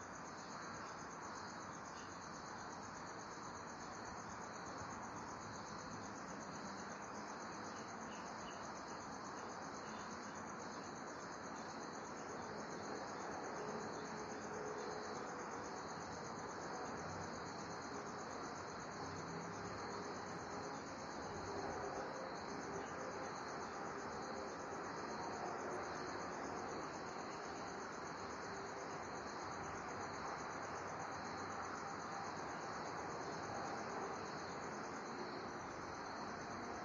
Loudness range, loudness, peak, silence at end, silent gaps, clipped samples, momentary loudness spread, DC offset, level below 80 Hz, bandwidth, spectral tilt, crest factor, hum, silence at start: 3 LU; -48 LUFS; -34 dBFS; 0 s; none; under 0.1%; 4 LU; under 0.1%; -74 dBFS; 11 kHz; -4 dB/octave; 14 dB; none; 0 s